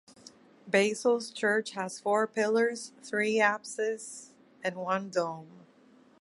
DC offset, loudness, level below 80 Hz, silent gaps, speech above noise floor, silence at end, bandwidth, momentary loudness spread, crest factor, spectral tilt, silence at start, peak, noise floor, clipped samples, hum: under 0.1%; -30 LUFS; -82 dBFS; none; 30 dB; 0.6 s; 11.5 kHz; 11 LU; 20 dB; -3.5 dB/octave; 0.65 s; -10 dBFS; -60 dBFS; under 0.1%; none